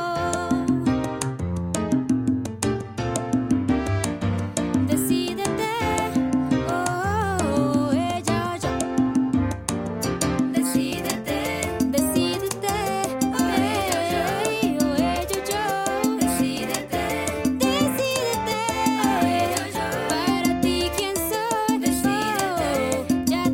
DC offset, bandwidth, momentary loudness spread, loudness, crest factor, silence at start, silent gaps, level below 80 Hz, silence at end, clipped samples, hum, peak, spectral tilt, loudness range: under 0.1%; 17 kHz; 4 LU; -23 LUFS; 20 dB; 0 s; none; -44 dBFS; 0 s; under 0.1%; none; -4 dBFS; -4.5 dB/octave; 2 LU